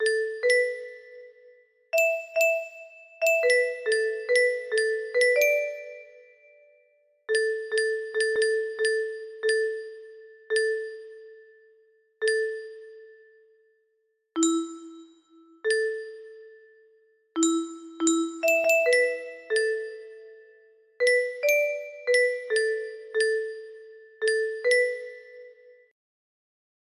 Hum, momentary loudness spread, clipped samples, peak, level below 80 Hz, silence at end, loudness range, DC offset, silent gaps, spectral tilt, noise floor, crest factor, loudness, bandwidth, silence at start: none; 20 LU; under 0.1%; -10 dBFS; -78 dBFS; 1.4 s; 7 LU; under 0.1%; none; -0.5 dB/octave; -73 dBFS; 18 dB; -25 LUFS; 14.5 kHz; 0 s